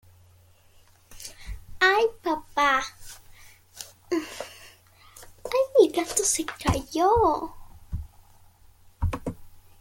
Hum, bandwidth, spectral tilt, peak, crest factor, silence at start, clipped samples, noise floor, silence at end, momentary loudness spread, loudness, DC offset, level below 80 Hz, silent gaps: none; 17 kHz; -3.5 dB/octave; -6 dBFS; 22 dB; 1.1 s; under 0.1%; -57 dBFS; 0.3 s; 22 LU; -24 LUFS; under 0.1%; -44 dBFS; none